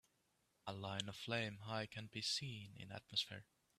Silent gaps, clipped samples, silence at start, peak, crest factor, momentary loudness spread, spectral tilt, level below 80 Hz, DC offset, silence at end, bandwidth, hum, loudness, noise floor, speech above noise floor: none; under 0.1%; 0.65 s; -26 dBFS; 22 dB; 12 LU; -3.5 dB/octave; -80 dBFS; under 0.1%; 0.35 s; 14.5 kHz; none; -45 LUFS; -82 dBFS; 35 dB